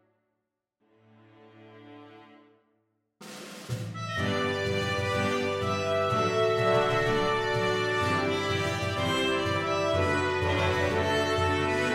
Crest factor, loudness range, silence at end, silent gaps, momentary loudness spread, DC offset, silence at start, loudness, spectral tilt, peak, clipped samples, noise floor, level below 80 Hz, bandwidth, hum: 16 dB; 9 LU; 0 s; none; 7 LU; under 0.1%; 1.6 s; -27 LUFS; -5 dB/octave; -12 dBFS; under 0.1%; -82 dBFS; -54 dBFS; 16 kHz; none